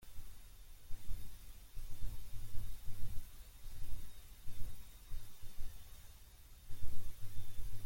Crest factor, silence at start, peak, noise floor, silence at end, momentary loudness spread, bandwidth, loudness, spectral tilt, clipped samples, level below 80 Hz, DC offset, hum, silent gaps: 14 dB; 0.05 s; -20 dBFS; -57 dBFS; 0 s; 8 LU; 16.5 kHz; -54 LUFS; -4.5 dB/octave; under 0.1%; -48 dBFS; under 0.1%; none; none